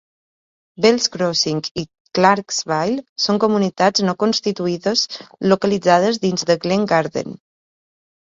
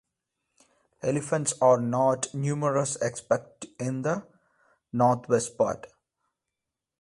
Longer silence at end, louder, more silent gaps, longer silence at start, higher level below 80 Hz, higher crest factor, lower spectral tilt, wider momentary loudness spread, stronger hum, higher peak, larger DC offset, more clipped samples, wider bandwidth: second, 0.95 s vs 1.15 s; first, -18 LUFS vs -27 LUFS; first, 1.71-1.75 s, 2.00-2.05 s, 3.09-3.16 s vs none; second, 0.8 s vs 1.05 s; first, -58 dBFS vs -66 dBFS; about the same, 18 dB vs 20 dB; second, -4 dB/octave vs -5.5 dB/octave; about the same, 9 LU vs 11 LU; neither; first, 0 dBFS vs -8 dBFS; neither; neither; second, 7.8 kHz vs 11.5 kHz